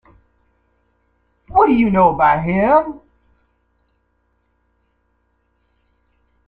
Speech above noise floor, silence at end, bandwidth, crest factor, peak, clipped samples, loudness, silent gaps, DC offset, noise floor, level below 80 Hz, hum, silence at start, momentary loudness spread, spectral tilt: 51 dB; 3.5 s; 4.7 kHz; 18 dB; -2 dBFS; under 0.1%; -15 LUFS; none; under 0.1%; -65 dBFS; -46 dBFS; none; 1.5 s; 10 LU; -10 dB/octave